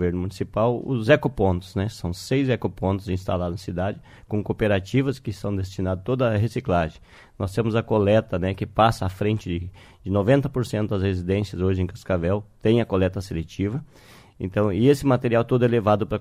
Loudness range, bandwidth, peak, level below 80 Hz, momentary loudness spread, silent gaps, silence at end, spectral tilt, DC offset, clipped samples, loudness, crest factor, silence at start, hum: 3 LU; 15 kHz; -2 dBFS; -46 dBFS; 9 LU; none; 0 s; -7.5 dB/octave; under 0.1%; under 0.1%; -23 LUFS; 20 dB; 0 s; none